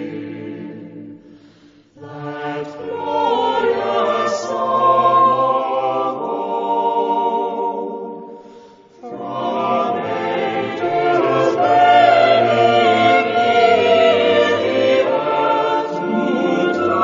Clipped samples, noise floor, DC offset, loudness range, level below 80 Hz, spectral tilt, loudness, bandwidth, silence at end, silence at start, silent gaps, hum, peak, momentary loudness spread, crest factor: under 0.1%; -48 dBFS; under 0.1%; 10 LU; -62 dBFS; -5.5 dB/octave; -16 LUFS; 7.6 kHz; 0 s; 0 s; none; none; 0 dBFS; 17 LU; 16 dB